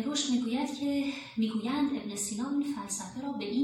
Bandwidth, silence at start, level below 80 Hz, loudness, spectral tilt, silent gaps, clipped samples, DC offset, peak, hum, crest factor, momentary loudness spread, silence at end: 16.5 kHz; 0 s; -68 dBFS; -32 LUFS; -3.5 dB/octave; none; under 0.1%; under 0.1%; -16 dBFS; none; 16 dB; 6 LU; 0 s